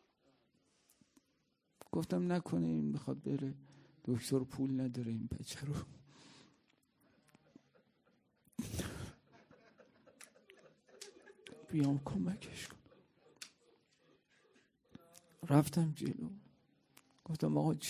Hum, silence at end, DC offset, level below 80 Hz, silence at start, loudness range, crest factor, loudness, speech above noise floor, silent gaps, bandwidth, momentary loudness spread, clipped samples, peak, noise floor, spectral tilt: none; 0 s; under 0.1%; -66 dBFS; 1.95 s; 12 LU; 26 dB; -39 LUFS; 43 dB; none; 16 kHz; 23 LU; under 0.1%; -16 dBFS; -80 dBFS; -6.5 dB/octave